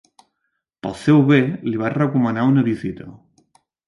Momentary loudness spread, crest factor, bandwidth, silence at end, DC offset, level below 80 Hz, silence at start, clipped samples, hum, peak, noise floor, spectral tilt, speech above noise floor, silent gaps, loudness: 16 LU; 16 dB; 11.5 kHz; 0.75 s; under 0.1%; -56 dBFS; 0.85 s; under 0.1%; none; -4 dBFS; -75 dBFS; -8.5 dB/octave; 57 dB; none; -18 LUFS